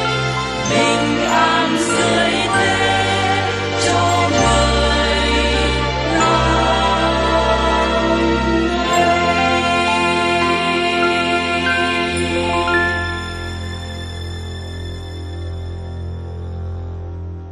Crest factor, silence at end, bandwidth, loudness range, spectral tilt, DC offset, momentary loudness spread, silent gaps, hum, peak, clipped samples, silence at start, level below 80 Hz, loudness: 14 dB; 0 s; 12.5 kHz; 12 LU; -4 dB/octave; under 0.1%; 14 LU; none; none; -2 dBFS; under 0.1%; 0 s; -30 dBFS; -16 LUFS